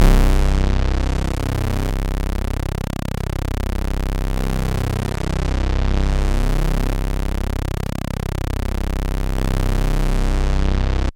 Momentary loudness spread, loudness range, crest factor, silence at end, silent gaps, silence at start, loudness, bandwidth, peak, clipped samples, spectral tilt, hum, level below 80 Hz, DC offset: 5 LU; 2 LU; 18 dB; 0.05 s; none; 0 s; -22 LUFS; 16.5 kHz; 0 dBFS; under 0.1%; -6 dB/octave; none; -20 dBFS; under 0.1%